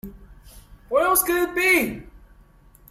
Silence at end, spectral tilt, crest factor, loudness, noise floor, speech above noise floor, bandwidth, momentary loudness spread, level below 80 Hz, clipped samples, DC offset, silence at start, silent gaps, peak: 0.75 s; -2.5 dB/octave; 18 dB; -20 LUFS; -52 dBFS; 32 dB; 16.5 kHz; 17 LU; -48 dBFS; under 0.1%; under 0.1%; 0.05 s; none; -6 dBFS